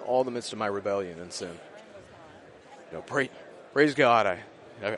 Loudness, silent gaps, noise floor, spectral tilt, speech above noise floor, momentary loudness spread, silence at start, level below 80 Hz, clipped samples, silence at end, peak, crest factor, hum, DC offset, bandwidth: -27 LUFS; none; -50 dBFS; -4.5 dB/octave; 23 dB; 26 LU; 0 s; -70 dBFS; under 0.1%; 0 s; -8 dBFS; 22 dB; none; under 0.1%; 11.5 kHz